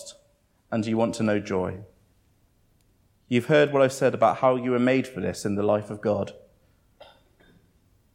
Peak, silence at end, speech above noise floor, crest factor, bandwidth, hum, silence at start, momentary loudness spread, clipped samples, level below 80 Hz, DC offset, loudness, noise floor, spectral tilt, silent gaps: -8 dBFS; 1.75 s; 41 dB; 18 dB; 16 kHz; none; 0 s; 10 LU; under 0.1%; -64 dBFS; under 0.1%; -24 LUFS; -64 dBFS; -6 dB/octave; none